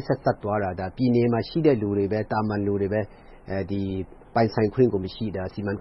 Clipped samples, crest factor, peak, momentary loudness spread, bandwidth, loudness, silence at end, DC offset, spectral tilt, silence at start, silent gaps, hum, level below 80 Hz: under 0.1%; 16 dB; -8 dBFS; 9 LU; 5.8 kHz; -25 LUFS; 0 s; under 0.1%; -10.5 dB/octave; 0 s; none; none; -50 dBFS